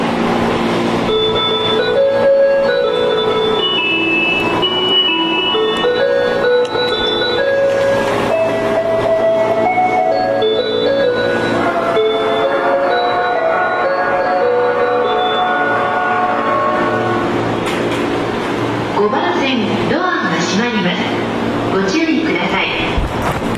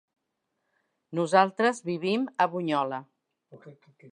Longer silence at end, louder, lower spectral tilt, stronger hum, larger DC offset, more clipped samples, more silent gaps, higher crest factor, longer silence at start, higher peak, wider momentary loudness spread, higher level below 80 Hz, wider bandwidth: about the same, 0 s vs 0.05 s; first, -14 LUFS vs -26 LUFS; about the same, -5 dB/octave vs -5.5 dB/octave; neither; neither; neither; neither; second, 10 dB vs 24 dB; second, 0 s vs 1.1 s; about the same, -4 dBFS vs -6 dBFS; second, 4 LU vs 11 LU; first, -38 dBFS vs -82 dBFS; first, 13.5 kHz vs 10.5 kHz